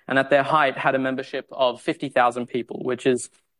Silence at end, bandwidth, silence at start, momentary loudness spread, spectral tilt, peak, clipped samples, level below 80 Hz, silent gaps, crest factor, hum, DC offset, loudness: 0.35 s; 11.5 kHz; 0.1 s; 10 LU; -4.5 dB/octave; -4 dBFS; under 0.1%; -72 dBFS; none; 18 dB; none; under 0.1%; -23 LUFS